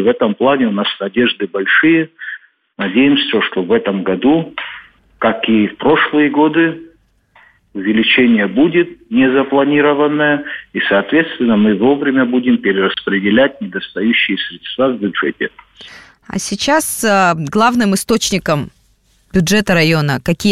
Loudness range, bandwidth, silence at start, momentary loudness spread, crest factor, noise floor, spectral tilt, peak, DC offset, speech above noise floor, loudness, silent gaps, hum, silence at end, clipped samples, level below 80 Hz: 3 LU; 15 kHz; 0 s; 11 LU; 12 dB; -55 dBFS; -4.5 dB/octave; -2 dBFS; under 0.1%; 41 dB; -14 LUFS; none; none; 0 s; under 0.1%; -48 dBFS